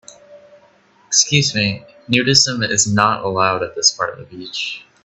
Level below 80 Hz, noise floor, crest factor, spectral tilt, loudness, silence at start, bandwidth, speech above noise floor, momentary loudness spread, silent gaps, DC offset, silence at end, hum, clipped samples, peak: -54 dBFS; -52 dBFS; 18 dB; -2.5 dB/octave; -16 LUFS; 0.3 s; 11.5 kHz; 35 dB; 12 LU; none; under 0.1%; 0.2 s; none; under 0.1%; 0 dBFS